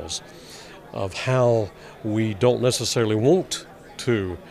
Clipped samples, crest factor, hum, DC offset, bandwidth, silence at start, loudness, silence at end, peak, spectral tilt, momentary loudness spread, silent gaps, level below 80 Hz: under 0.1%; 18 dB; none; under 0.1%; 15.5 kHz; 0 s; -23 LUFS; 0 s; -6 dBFS; -5 dB/octave; 20 LU; none; -54 dBFS